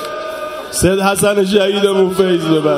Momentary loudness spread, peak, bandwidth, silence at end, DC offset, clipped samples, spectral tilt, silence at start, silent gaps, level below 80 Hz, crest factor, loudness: 11 LU; 0 dBFS; 16 kHz; 0 s; under 0.1%; under 0.1%; -4.5 dB/octave; 0 s; none; -38 dBFS; 14 dB; -14 LUFS